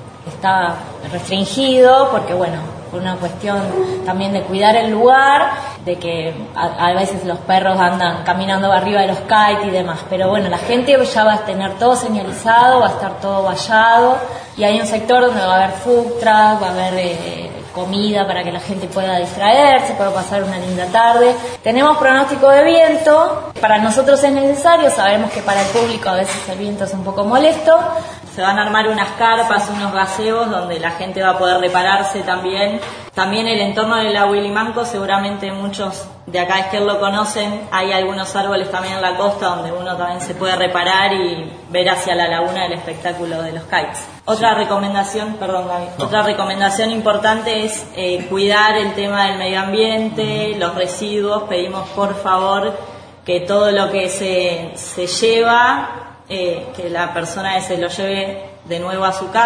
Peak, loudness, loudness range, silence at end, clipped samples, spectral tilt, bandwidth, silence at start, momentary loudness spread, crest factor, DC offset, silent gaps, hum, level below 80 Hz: 0 dBFS; -15 LUFS; 6 LU; 0 s; under 0.1%; -4 dB/octave; 11 kHz; 0 s; 11 LU; 16 dB; under 0.1%; none; none; -54 dBFS